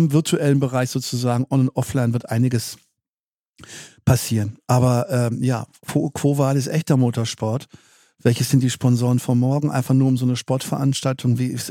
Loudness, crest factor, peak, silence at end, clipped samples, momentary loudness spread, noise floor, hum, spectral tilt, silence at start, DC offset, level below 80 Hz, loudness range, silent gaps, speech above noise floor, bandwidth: -20 LUFS; 18 dB; -2 dBFS; 0 s; under 0.1%; 7 LU; under -90 dBFS; none; -6.5 dB/octave; 0 s; under 0.1%; -54 dBFS; 3 LU; 3.09-3.54 s; over 71 dB; 16.5 kHz